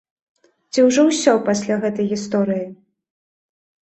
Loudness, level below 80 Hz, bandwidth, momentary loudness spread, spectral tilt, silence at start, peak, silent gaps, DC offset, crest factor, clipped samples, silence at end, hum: -18 LUFS; -64 dBFS; 8.6 kHz; 10 LU; -4.5 dB/octave; 0.75 s; -2 dBFS; none; under 0.1%; 18 dB; under 0.1%; 1.15 s; none